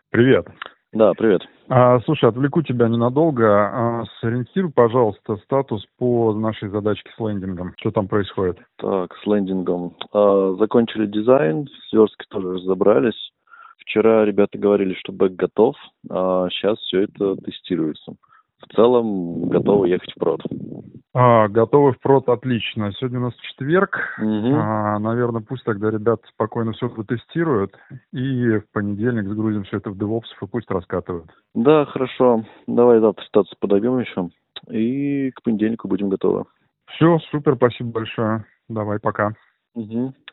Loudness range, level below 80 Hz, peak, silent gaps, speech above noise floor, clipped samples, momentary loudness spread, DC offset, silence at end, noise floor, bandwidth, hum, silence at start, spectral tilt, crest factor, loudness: 5 LU; -58 dBFS; 0 dBFS; none; 27 dB; under 0.1%; 12 LU; under 0.1%; 0.2 s; -47 dBFS; 4 kHz; none; 0.15 s; -6 dB/octave; 20 dB; -20 LUFS